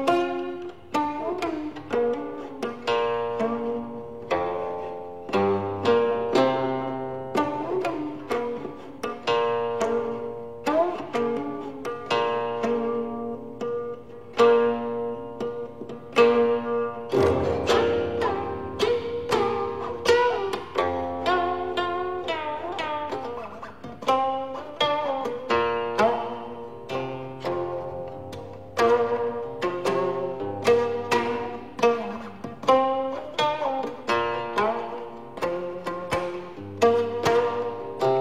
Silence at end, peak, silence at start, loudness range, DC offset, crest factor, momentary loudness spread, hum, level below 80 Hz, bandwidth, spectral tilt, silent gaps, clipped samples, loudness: 0 s; -6 dBFS; 0 s; 4 LU; 0.4%; 20 dB; 13 LU; none; -56 dBFS; 13.5 kHz; -5 dB/octave; none; under 0.1%; -26 LUFS